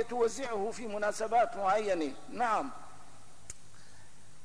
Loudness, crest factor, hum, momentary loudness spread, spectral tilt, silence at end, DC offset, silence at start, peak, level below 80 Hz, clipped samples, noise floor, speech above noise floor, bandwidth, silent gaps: -32 LUFS; 16 dB; none; 21 LU; -3.5 dB/octave; 0.4 s; 0.8%; 0 s; -18 dBFS; -66 dBFS; under 0.1%; -58 dBFS; 26 dB; 11 kHz; none